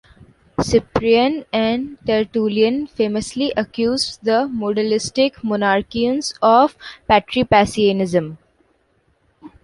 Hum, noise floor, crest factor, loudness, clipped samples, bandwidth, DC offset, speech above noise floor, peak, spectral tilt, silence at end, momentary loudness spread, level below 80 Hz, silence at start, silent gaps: none; -62 dBFS; 18 dB; -18 LUFS; under 0.1%; 11.5 kHz; under 0.1%; 44 dB; -2 dBFS; -5 dB/octave; 0.15 s; 6 LU; -44 dBFS; 0.6 s; none